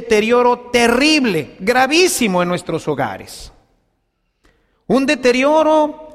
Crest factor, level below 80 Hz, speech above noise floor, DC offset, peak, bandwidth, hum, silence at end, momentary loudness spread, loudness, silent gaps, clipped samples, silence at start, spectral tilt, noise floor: 14 dB; -46 dBFS; 52 dB; under 0.1%; -2 dBFS; 15.5 kHz; none; 0.05 s; 9 LU; -15 LUFS; none; under 0.1%; 0 s; -4 dB/octave; -67 dBFS